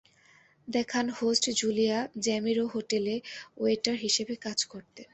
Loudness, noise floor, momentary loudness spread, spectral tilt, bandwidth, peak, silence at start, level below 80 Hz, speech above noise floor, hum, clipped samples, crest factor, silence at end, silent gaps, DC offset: -29 LUFS; -61 dBFS; 7 LU; -2.5 dB/octave; 8.6 kHz; -10 dBFS; 0.65 s; -70 dBFS; 32 dB; none; under 0.1%; 20 dB; 0.1 s; none; under 0.1%